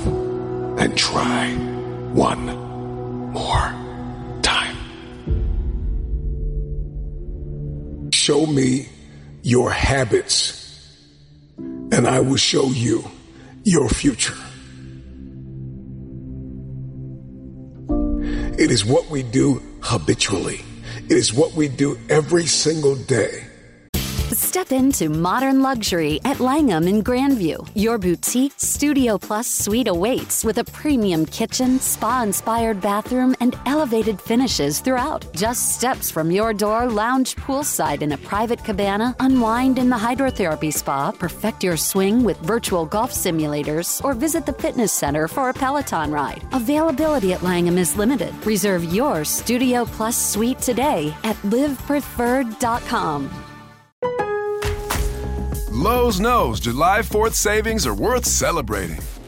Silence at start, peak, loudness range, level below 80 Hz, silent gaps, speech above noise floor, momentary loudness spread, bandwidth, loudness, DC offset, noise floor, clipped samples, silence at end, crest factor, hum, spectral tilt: 0 s; -2 dBFS; 5 LU; -34 dBFS; 23.89-23.93 s, 53.92-54.02 s; 28 dB; 14 LU; 16.5 kHz; -20 LUFS; under 0.1%; -48 dBFS; under 0.1%; 0 s; 18 dB; none; -4 dB/octave